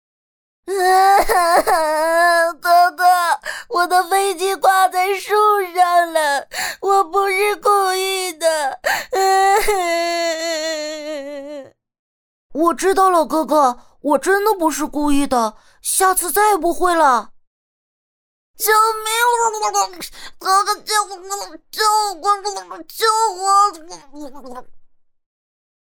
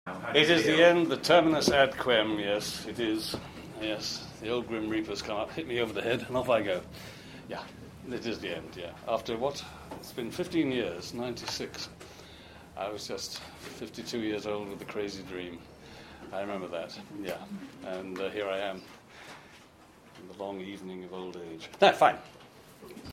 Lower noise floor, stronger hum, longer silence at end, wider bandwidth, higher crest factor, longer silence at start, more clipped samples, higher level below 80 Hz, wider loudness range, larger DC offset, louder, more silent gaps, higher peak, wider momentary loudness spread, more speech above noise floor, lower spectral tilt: first, under -90 dBFS vs -56 dBFS; neither; first, 1.05 s vs 0 s; first, over 20 kHz vs 16 kHz; second, 14 dB vs 24 dB; first, 0.65 s vs 0.05 s; neither; first, -44 dBFS vs -62 dBFS; second, 5 LU vs 11 LU; neither; first, -16 LUFS vs -30 LUFS; first, 11.99-12.50 s, 17.47-18.54 s vs none; first, -2 dBFS vs -6 dBFS; second, 13 LU vs 23 LU; first, over 73 dB vs 25 dB; second, -1 dB/octave vs -4 dB/octave